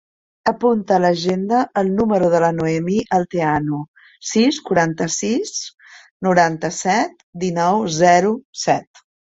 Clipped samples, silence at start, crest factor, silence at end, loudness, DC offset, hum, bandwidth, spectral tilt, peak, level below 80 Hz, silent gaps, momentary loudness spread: under 0.1%; 0.45 s; 16 dB; 0.5 s; -18 LUFS; under 0.1%; none; 8.2 kHz; -5 dB/octave; -2 dBFS; -54 dBFS; 3.88-3.94 s, 5.74-5.78 s, 6.11-6.20 s, 7.23-7.33 s, 8.45-8.53 s; 9 LU